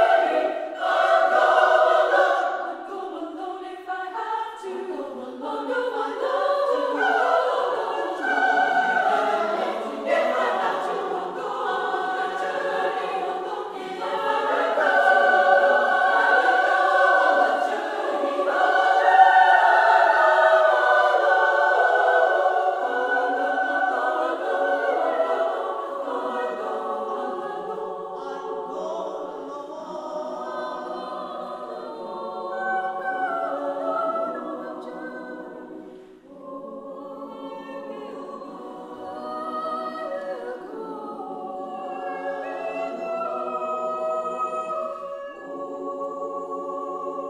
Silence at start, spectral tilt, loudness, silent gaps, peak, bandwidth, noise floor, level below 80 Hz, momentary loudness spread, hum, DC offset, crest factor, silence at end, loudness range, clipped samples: 0 s; -3 dB/octave; -22 LUFS; none; -4 dBFS; 11.5 kHz; -44 dBFS; -72 dBFS; 18 LU; none; under 0.1%; 20 dB; 0 s; 15 LU; under 0.1%